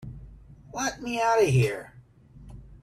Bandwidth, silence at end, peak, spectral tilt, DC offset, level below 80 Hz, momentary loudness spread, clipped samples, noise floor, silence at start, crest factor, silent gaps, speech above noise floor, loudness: 14 kHz; 0.05 s; -10 dBFS; -5.5 dB/octave; under 0.1%; -50 dBFS; 26 LU; under 0.1%; -52 dBFS; 0 s; 18 dB; none; 27 dB; -25 LUFS